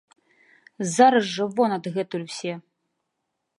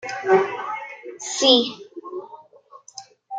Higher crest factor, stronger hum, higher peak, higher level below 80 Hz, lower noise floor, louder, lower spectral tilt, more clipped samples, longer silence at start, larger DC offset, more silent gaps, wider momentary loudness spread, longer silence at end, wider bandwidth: about the same, 20 dB vs 22 dB; neither; about the same, -4 dBFS vs -2 dBFS; about the same, -78 dBFS vs -76 dBFS; first, -79 dBFS vs -49 dBFS; second, -23 LUFS vs -20 LUFS; first, -4.5 dB/octave vs -2 dB/octave; neither; first, 0.8 s vs 0 s; neither; neither; second, 14 LU vs 25 LU; first, 1 s vs 0 s; first, 11.5 kHz vs 9.4 kHz